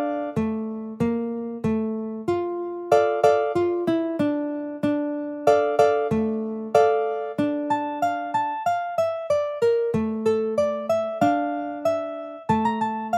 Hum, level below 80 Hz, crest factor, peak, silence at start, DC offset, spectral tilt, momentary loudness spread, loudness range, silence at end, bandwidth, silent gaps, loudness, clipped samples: none; -58 dBFS; 18 dB; -4 dBFS; 0 s; under 0.1%; -7 dB/octave; 8 LU; 2 LU; 0 s; 13 kHz; none; -24 LUFS; under 0.1%